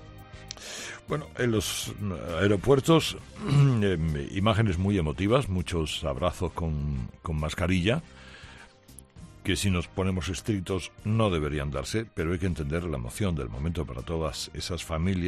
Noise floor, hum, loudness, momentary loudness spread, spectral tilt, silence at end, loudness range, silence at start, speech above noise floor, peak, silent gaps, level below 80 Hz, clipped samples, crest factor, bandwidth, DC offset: -52 dBFS; none; -28 LUFS; 13 LU; -5.5 dB/octave; 0 s; 6 LU; 0 s; 25 dB; -8 dBFS; none; -44 dBFS; under 0.1%; 20 dB; 14 kHz; under 0.1%